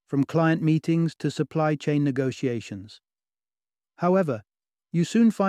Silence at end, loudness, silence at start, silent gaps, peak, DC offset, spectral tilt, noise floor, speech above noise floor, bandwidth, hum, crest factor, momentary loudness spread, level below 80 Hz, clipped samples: 0 s; -25 LUFS; 0.1 s; none; -10 dBFS; under 0.1%; -7.5 dB/octave; under -90 dBFS; over 67 dB; 11 kHz; none; 16 dB; 9 LU; -70 dBFS; under 0.1%